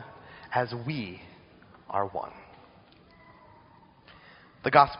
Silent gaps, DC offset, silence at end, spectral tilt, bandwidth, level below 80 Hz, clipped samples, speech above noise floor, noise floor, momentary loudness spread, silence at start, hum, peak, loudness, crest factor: none; under 0.1%; 0 s; -3.5 dB/octave; 5.4 kHz; -62 dBFS; under 0.1%; 30 dB; -57 dBFS; 26 LU; 0 s; none; -4 dBFS; -30 LUFS; 28 dB